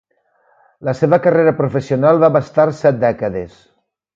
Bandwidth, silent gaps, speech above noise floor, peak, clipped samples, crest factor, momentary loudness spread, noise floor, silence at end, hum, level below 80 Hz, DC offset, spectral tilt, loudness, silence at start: 7.6 kHz; none; 45 dB; 0 dBFS; under 0.1%; 16 dB; 12 LU; -59 dBFS; 0.7 s; none; -52 dBFS; under 0.1%; -8.5 dB/octave; -15 LUFS; 0.8 s